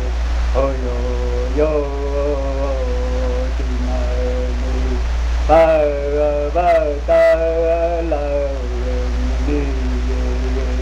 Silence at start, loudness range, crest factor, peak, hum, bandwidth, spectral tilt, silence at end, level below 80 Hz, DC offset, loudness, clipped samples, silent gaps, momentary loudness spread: 0 s; 5 LU; 14 dB; -2 dBFS; none; 7.8 kHz; -7 dB/octave; 0 s; -20 dBFS; under 0.1%; -18 LUFS; under 0.1%; none; 8 LU